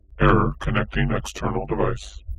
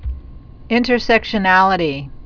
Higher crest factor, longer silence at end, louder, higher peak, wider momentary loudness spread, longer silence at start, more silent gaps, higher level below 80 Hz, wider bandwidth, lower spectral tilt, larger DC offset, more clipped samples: about the same, 20 dB vs 16 dB; about the same, 0.05 s vs 0 s; second, -23 LUFS vs -15 LUFS; about the same, -2 dBFS vs 0 dBFS; second, 9 LU vs 13 LU; about the same, 0.1 s vs 0 s; neither; about the same, -30 dBFS vs -34 dBFS; first, 12.5 kHz vs 5.4 kHz; about the same, -6.5 dB/octave vs -6 dB/octave; neither; neither